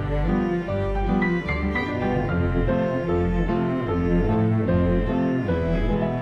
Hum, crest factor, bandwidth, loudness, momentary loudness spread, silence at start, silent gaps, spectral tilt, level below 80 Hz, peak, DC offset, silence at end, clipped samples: none; 12 dB; 6.4 kHz; -23 LUFS; 3 LU; 0 s; none; -9.5 dB/octave; -30 dBFS; -10 dBFS; under 0.1%; 0 s; under 0.1%